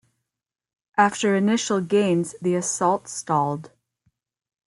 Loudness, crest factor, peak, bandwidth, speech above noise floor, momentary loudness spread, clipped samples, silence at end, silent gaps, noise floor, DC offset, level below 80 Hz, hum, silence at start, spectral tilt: -22 LUFS; 20 dB; -4 dBFS; 12 kHz; 65 dB; 7 LU; under 0.1%; 1 s; none; -87 dBFS; under 0.1%; -70 dBFS; none; 0.95 s; -4.5 dB/octave